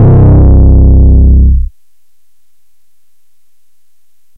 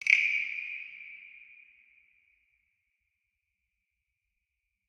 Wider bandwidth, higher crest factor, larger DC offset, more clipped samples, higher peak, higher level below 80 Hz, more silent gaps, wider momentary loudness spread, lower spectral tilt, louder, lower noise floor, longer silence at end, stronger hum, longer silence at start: second, 1.8 kHz vs 11 kHz; second, 6 dB vs 30 dB; neither; neither; first, 0 dBFS vs -6 dBFS; first, -8 dBFS vs -84 dBFS; neither; second, 8 LU vs 26 LU; first, -13 dB/octave vs 3 dB/octave; first, -6 LUFS vs -28 LUFS; second, -62 dBFS vs -84 dBFS; second, 2.7 s vs 3.45 s; neither; about the same, 0 s vs 0 s